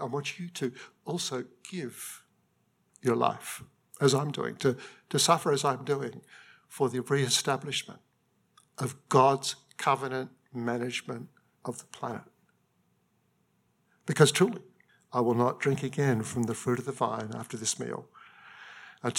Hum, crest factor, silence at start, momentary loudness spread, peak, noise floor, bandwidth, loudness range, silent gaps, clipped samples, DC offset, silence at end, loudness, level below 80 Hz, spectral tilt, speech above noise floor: none; 24 dB; 0 s; 18 LU; -6 dBFS; -72 dBFS; 16.5 kHz; 7 LU; none; under 0.1%; under 0.1%; 0 s; -29 LUFS; -78 dBFS; -4.5 dB/octave; 42 dB